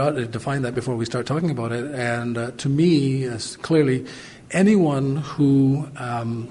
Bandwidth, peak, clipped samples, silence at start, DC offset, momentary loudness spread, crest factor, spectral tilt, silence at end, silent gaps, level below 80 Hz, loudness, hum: 11.5 kHz; -6 dBFS; under 0.1%; 0 s; under 0.1%; 9 LU; 16 dB; -7 dB/octave; 0 s; none; -54 dBFS; -22 LUFS; none